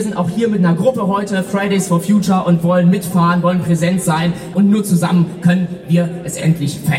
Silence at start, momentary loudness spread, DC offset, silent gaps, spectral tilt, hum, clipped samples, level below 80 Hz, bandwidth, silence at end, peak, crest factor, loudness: 0 s; 5 LU; under 0.1%; none; -6.5 dB/octave; none; under 0.1%; -50 dBFS; 15.5 kHz; 0 s; -2 dBFS; 12 dB; -15 LUFS